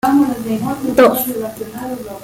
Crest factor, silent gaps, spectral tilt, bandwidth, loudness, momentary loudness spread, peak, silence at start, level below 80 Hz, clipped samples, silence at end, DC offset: 14 dB; none; -5 dB/octave; 17 kHz; -16 LUFS; 14 LU; -2 dBFS; 0.05 s; -48 dBFS; under 0.1%; 0 s; under 0.1%